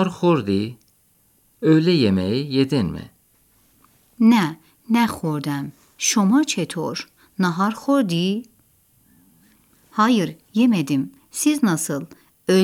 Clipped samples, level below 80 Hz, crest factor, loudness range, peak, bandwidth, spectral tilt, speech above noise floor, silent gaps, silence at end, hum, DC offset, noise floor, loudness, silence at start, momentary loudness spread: under 0.1%; -60 dBFS; 16 dB; 3 LU; -4 dBFS; 16.5 kHz; -5 dB/octave; 41 dB; none; 0 s; none; under 0.1%; -60 dBFS; -20 LUFS; 0 s; 13 LU